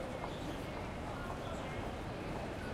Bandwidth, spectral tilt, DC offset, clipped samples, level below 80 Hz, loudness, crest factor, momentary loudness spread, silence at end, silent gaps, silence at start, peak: 16 kHz; -6 dB/octave; under 0.1%; under 0.1%; -52 dBFS; -42 LUFS; 14 dB; 1 LU; 0 s; none; 0 s; -28 dBFS